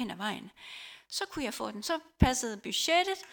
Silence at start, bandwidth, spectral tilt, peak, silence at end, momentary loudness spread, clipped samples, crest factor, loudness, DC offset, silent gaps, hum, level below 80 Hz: 0 s; 19 kHz; -3.5 dB/octave; -8 dBFS; 0 s; 17 LU; under 0.1%; 24 dB; -31 LUFS; under 0.1%; none; none; -44 dBFS